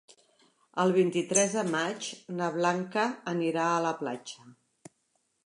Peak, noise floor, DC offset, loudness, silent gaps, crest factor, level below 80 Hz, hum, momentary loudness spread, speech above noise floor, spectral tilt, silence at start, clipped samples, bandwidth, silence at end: -10 dBFS; -75 dBFS; under 0.1%; -29 LUFS; none; 22 dB; -82 dBFS; none; 12 LU; 46 dB; -4 dB/octave; 0.75 s; under 0.1%; 11.5 kHz; 0.95 s